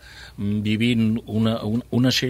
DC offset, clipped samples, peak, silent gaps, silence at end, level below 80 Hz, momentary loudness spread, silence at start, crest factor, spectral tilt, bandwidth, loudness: under 0.1%; under 0.1%; -8 dBFS; none; 0 s; -48 dBFS; 8 LU; 0.05 s; 14 dB; -5.5 dB/octave; 15.5 kHz; -22 LUFS